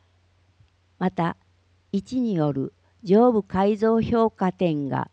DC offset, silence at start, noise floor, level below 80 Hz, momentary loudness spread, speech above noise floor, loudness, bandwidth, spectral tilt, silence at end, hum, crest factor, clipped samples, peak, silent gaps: under 0.1%; 1 s; -62 dBFS; -56 dBFS; 12 LU; 40 dB; -23 LUFS; 8.2 kHz; -8.5 dB/octave; 0.1 s; none; 16 dB; under 0.1%; -8 dBFS; none